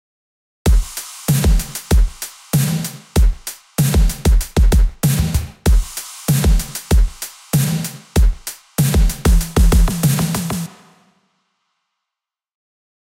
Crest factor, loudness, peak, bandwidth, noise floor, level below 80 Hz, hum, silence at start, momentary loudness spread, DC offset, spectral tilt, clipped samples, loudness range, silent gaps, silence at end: 14 dB; -18 LUFS; -2 dBFS; 17 kHz; -85 dBFS; -18 dBFS; none; 0.65 s; 9 LU; under 0.1%; -5 dB/octave; under 0.1%; 2 LU; none; 2.45 s